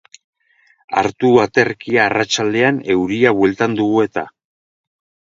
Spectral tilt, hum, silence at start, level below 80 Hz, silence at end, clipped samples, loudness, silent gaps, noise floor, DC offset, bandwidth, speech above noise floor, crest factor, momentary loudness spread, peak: -5 dB/octave; none; 0.9 s; -54 dBFS; 0.95 s; under 0.1%; -16 LUFS; none; -57 dBFS; under 0.1%; 7.6 kHz; 41 dB; 16 dB; 6 LU; 0 dBFS